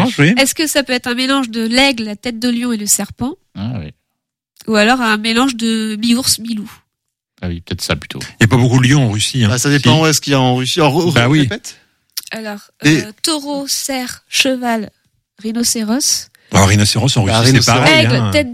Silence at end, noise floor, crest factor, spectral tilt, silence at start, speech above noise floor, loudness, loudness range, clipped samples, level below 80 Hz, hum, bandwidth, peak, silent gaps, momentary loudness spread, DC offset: 0 s; -76 dBFS; 14 dB; -4 dB/octave; 0 s; 62 dB; -13 LUFS; 5 LU; under 0.1%; -42 dBFS; none; 16.5 kHz; 0 dBFS; none; 15 LU; under 0.1%